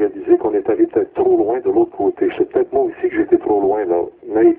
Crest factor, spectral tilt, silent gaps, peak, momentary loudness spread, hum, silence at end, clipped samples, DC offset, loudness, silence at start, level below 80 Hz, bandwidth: 14 dB; -11.5 dB/octave; none; -2 dBFS; 4 LU; none; 0.05 s; under 0.1%; under 0.1%; -17 LUFS; 0 s; -52 dBFS; 3.5 kHz